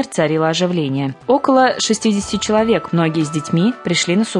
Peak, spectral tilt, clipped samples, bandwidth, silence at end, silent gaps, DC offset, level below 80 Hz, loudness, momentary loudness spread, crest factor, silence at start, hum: -2 dBFS; -5 dB/octave; under 0.1%; 11 kHz; 0 s; none; under 0.1%; -50 dBFS; -16 LUFS; 5 LU; 14 dB; 0 s; none